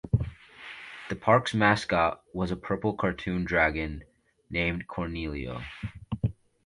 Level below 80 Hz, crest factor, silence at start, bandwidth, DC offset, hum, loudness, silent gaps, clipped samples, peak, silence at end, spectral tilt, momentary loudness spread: -44 dBFS; 22 dB; 0.05 s; 11.5 kHz; under 0.1%; none; -28 LUFS; none; under 0.1%; -8 dBFS; 0.35 s; -6.5 dB/octave; 17 LU